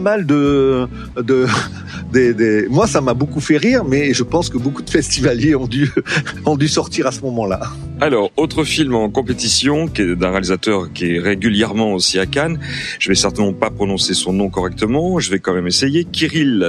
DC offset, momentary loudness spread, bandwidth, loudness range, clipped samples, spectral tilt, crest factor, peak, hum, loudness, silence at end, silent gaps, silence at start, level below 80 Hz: under 0.1%; 6 LU; 13.5 kHz; 2 LU; under 0.1%; -4.5 dB/octave; 16 dB; 0 dBFS; none; -16 LUFS; 0 s; none; 0 s; -38 dBFS